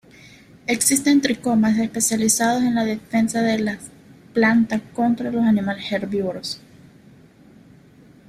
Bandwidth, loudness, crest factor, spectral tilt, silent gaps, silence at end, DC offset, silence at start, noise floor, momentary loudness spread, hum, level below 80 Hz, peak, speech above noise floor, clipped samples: 15.5 kHz; -20 LUFS; 20 dB; -3.5 dB/octave; none; 1.7 s; under 0.1%; 0.7 s; -49 dBFS; 10 LU; none; -58 dBFS; -2 dBFS; 29 dB; under 0.1%